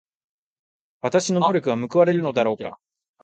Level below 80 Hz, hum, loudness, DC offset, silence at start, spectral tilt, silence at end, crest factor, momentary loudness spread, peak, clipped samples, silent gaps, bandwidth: -68 dBFS; none; -21 LUFS; under 0.1%; 1.05 s; -5.5 dB/octave; 0.5 s; 18 dB; 11 LU; -4 dBFS; under 0.1%; none; 9.2 kHz